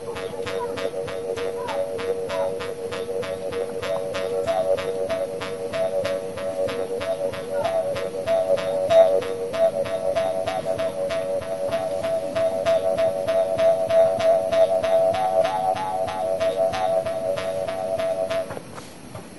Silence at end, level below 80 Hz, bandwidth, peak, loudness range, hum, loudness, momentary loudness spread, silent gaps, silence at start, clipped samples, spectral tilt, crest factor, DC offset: 0 s; -56 dBFS; 11.5 kHz; -4 dBFS; 6 LU; none; -24 LUFS; 9 LU; none; 0 s; under 0.1%; -4.5 dB/octave; 20 dB; 0.5%